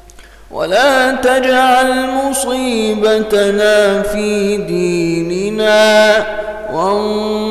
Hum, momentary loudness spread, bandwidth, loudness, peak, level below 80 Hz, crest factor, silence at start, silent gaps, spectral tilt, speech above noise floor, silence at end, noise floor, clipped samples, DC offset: none; 7 LU; 15.5 kHz; -13 LUFS; 0 dBFS; -40 dBFS; 12 dB; 0.1 s; none; -4 dB/octave; 25 dB; 0 s; -38 dBFS; under 0.1%; under 0.1%